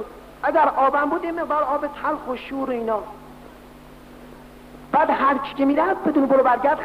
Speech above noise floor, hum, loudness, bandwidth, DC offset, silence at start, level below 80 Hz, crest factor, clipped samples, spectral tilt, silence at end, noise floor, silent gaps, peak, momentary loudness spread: 23 dB; none; -21 LUFS; 15.5 kHz; under 0.1%; 0 s; -52 dBFS; 16 dB; under 0.1%; -6.5 dB/octave; 0 s; -44 dBFS; none; -6 dBFS; 11 LU